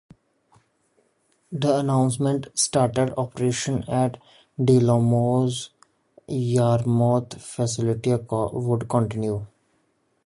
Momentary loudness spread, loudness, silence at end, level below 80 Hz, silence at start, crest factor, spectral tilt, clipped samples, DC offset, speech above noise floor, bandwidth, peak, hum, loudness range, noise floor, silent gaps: 9 LU; -23 LUFS; 0.8 s; -54 dBFS; 1.5 s; 16 dB; -6 dB/octave; under 0.1%; under 0.1%; 46 dB; 11.5 kHz; -6 dBFS; none; 2 LU; -68 dBFS; none